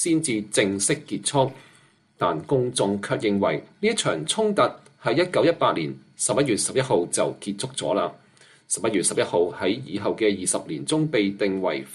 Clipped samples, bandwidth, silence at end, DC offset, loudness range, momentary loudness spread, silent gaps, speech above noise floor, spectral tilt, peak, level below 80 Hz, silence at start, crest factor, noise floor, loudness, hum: under 0.1%; 12.5 kHz; 0 s; under 0.1%; 2 LU; 6 LU; none; 34 dB; -4 dB/octave; -6 dBFS; -64 dBFS; 0 s; 18 dB; -57 dBFS; -24 LUFS; none